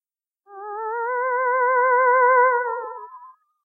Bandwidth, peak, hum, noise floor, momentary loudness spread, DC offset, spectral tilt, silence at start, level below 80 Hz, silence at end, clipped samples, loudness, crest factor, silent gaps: 2.3 kHz; -6 dBFS; none; -62 dBFS; 19 LU; under 0.1%; -6 dB/octave; 0.5 s; under -90 dBFS; 0.35 s; under 0.1%; -19 LUFS; 16 dB; none